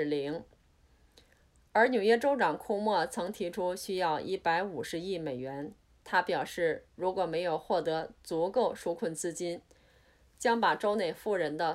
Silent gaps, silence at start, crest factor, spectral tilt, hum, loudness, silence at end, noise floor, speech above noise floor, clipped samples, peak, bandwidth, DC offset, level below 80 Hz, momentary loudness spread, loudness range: none; 0 s; 20 dB; -4.5 dB/octave; none; -31 LUFS; 0 s; -65 dBFS; 34 dB; under 0.1%; -12 dBFS; 15.5 kHz; under 0.1%; -66 dBFS; 11 LU; 3 LU